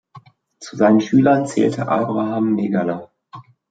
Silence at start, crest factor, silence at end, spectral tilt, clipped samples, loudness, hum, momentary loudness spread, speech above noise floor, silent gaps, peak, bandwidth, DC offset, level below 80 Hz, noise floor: 0.15 s; 16 dB; 0.3 s; -7 dB/octave; under 0.1%; -17 LUFS; none; 13 LU; 29 dB; none; -2 dBFS; 9.2 kHz; under 0.1%; -64 dBFS; -46 dBFS